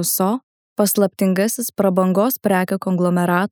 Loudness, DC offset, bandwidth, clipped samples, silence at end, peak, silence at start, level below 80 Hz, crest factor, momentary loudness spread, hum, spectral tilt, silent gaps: -18 LUFS; under 0.1%; 20 kHz; under 0.1%; 0.05 s; -2 dBFS; 0 s; -66 dBFS; 16 dB; 4 LU; none; -5.5 dB/octave; 0.43-0.76 s